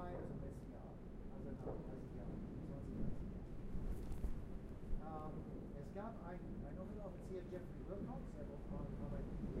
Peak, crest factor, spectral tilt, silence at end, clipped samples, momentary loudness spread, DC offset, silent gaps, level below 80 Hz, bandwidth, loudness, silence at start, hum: -30 dBFS; 16 dB; -9 dB/octave; 0 s; under 0.1%; 4 LU; under 0.1%; none; -52 dBFS; 12.5 kHz; -51 LUFS; 0 s; none